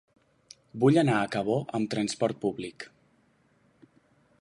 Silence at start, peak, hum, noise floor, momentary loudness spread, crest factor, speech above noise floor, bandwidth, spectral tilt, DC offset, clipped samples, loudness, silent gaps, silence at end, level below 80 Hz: 0.75 s; -10 dBFS; none; -66 dBFS; 20 LU; 20 dB; 39 dB; 11.5 kHz; -6 dB/octave; under 0.1%; under 0.1%; -27 LUFS; none; 1.55 s; -68 dBFS